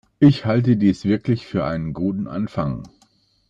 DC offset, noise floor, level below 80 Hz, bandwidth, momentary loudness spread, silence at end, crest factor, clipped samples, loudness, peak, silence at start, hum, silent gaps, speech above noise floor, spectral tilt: under 0.1%; -60 dBFS; -48 dBFS; 7.8 kHz; 10 LU; 0.6 s; 18 dB; under 0.1%; -20 LUFS; -2 dBFS; 0.2 s; none; none; 41 dB; -8.5 dB/octave